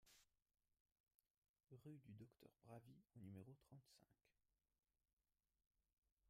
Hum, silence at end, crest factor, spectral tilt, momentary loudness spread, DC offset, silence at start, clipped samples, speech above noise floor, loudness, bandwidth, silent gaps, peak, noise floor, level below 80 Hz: none; 0 s; 20 dB; -6.5 dB/octave; 7 LU; under 0.1%; 0 s; under 0.1%; over 25 dB; -65 LUFS; 15 kHz; 0.80-0.85 s, 1.00-1.04 s, 1.15-1.19 s, 1.30-1.42 s, 1.49-1.54 s, 5.13-5.17 s, 5.93-6.02 s; -48 dBFS; under -90 dBFS; under -90 dBFS